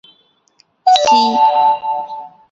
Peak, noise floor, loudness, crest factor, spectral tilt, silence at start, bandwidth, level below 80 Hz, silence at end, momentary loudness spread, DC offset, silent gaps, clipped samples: 0 dBFS; -56 dBFS; -13 LUFS; 14 dB; -2 dB/octave; 0.85 s; 7.8 kHz; -60 dBFS; 0.25 s; 15 LU; under 0.1%; none; under 0.1%